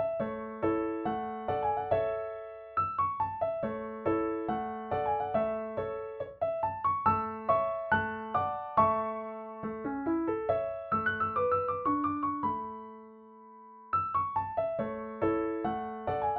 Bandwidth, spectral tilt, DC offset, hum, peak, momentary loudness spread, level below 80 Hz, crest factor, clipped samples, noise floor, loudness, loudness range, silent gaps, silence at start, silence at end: 4.8 kHz; -5.5 dB/octave; under 0.1%; none; -12 dBFS; 9 LU; -62 dBFS; 20 dB; under 0.1%; -52 dBFS; -32 LUFS; 3 LU; none; 0 s; 0 s